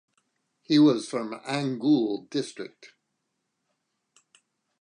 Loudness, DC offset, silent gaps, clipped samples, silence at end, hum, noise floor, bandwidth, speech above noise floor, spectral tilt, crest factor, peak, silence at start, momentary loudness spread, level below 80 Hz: -25 LUFS; under 0.1%; none; under 0.1%; 1.95 s; none; -79 dBFS; 10.5 kHz; 54 dB; -6 dB/octave; 18 dB; -10 dBFS; 0.7 s; 16 LU; -84 dBFS